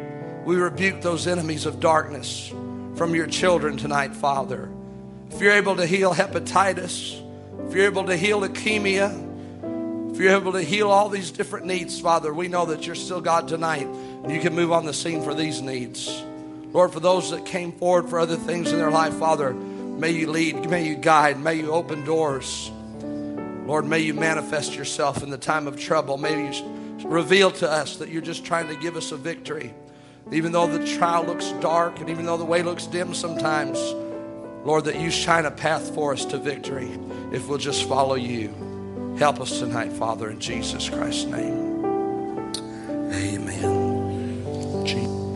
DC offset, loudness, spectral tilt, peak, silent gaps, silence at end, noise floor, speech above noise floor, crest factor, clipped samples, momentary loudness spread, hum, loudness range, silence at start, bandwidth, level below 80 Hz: under 0.1%; -24 LUFS; -4.5 dB/octave; -2 dBFS; none; 0 s; -44 dBFS; 21 dB; 22 dB; under 0.1%; 12 LU; none; 4 LU; 0 s; 11.5 kHz; -56 dBFS